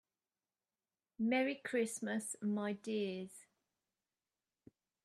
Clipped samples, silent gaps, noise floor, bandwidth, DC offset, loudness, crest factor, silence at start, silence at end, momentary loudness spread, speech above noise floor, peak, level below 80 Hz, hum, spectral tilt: under 0.1%; none; under -90 dBFS; 13 kHz; under 0.1%; -39 LUFS; 18 dB; 1.2 s; 1.65 s; 10 LU; over 52 dB; -24 dBFS; -88 dBFS; none; -4.5 dB/octave